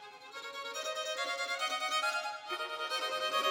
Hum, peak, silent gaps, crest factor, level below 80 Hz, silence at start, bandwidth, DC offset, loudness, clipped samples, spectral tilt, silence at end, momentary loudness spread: none; -20 dBFS; none; 16 dB; under -90 dBFS; 0 s; 19 kHz; under 0.1%; -35 LUFS; under 0.1%; 1 dB/octave; 0 s; 10 LU